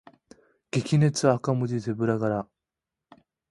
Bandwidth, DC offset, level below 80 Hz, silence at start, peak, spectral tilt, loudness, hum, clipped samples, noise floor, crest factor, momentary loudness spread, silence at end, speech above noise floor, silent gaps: 11.5 kHz; under 0.1%; -62 dBFS; 0.75 s; -6 dBFS; -6.5 dB/octave; -26 LUFS; none; under 0.1%; -88 dBFS; 22 dB; 9 LU; 1.05 s; 64 dB; none